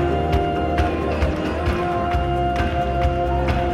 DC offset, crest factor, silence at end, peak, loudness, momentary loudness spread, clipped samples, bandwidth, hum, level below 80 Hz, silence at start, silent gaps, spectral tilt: under 0.1%; 14 dB; 0 s; -6 dBFS; -21 LUFS; 1 LU; under 0.1%; 11.5 kHz; none; -26 dBFS; 0 s; none; -7.5 dB/octave